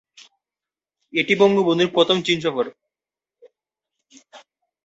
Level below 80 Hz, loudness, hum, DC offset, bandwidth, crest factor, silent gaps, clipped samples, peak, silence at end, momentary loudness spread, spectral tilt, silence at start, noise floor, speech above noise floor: -66 dBFS; -19 LUFS; none; under 0.1%; 8 kHz; 20 dB; none; under 0.1%; -2 dBFS; 0.5 s; 10 LU; -5 dB/octave; 1.15 s; -90 dBFS; 72 dB